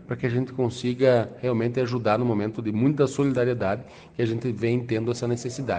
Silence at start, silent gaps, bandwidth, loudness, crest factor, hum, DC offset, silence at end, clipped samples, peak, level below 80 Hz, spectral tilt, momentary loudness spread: 0 s; none; 9.4 kHz; -25 LUFS; 18 dB; none; under 0.1%; 0 s; under 0.1%; -6 dBFS; -58 dBFS; -7 dB/octave; 6 LU